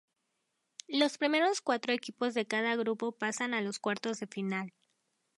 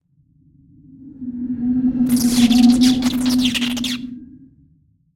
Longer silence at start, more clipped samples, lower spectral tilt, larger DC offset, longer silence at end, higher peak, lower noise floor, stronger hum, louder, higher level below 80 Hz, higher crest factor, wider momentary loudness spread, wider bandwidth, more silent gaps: about the same, 0.9 s vs 1 s; neither; about the same, -3.5 dB/octave vs -3.5 dB/octave; neither; about the same, 0.7 s vs 0.8 s; second, -12 dBFS vs -2 dBFS; first, -82 dBFS vs -57 dBFS; neither; second, -32 LUFS vs -17 LUFS; second, -86 dBFS vs -44 dBFS; first, 22 dB vs 16 dB; second, 9 LU vs 18 LU; second, 11.5 kHz vs 16.5 kHz; neither